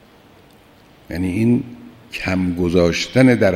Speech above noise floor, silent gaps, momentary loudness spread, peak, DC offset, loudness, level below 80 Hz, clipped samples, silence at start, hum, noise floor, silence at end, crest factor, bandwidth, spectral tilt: 32 dB; none; 16 LU; 0 dBFS; under 0.1%; -18 LUFS; -44 dBFS; under 0.1%; 1.1 s; none; -48 dBFS; 0 s; 18 dB; 14.5 kHz; -6.5 dB/octave